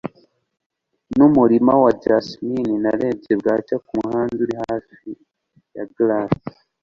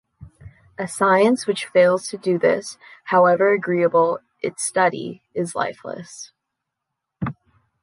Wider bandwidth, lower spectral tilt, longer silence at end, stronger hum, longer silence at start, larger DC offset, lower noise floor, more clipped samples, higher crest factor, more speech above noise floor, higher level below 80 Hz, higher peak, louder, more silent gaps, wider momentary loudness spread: second, 7.2 kHz vs 11.5 kHz; first, -8.5 dB/octave vs -4.5 dB/octave; second, 0.35 s vs 0.5 s; neither; second, 0.05 s vs 0.2 s; neither; second, -56 dBFS vs -81 dBFS; neither; about the same, 18 dB vs 16 dB; second, 38 dB vs 62 dB; about the same, -54 dBFS vs -58 dBFS; about the same, -2 dBFS vs -4 dBFS; about the same, -19 LUFS vs -20 LUFS; first, 0.66-0.70 s vs none; first, 22 LU vs 18 LU